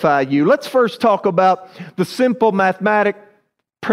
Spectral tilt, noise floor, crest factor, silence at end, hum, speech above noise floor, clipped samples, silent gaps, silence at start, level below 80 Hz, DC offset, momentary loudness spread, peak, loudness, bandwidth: -6.5 dB/octave; -62 dBFS; 14 dB; 0 s; none; 46 dB; under 0.1%; none; 0 s; -64 dBFS; under 0.1%; 9 LU; -2 dBFS; -16 LUFS; 15.5 kHz